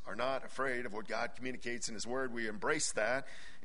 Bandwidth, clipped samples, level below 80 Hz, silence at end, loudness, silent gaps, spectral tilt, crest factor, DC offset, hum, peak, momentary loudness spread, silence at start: 10.5 kHz; under 0.1%; -64 dBFS; 0 s; -37 LUFS; none; -2.5 dB/octave; 20 dB; 1%; none; -18 dBFS; 7 LU; 0 s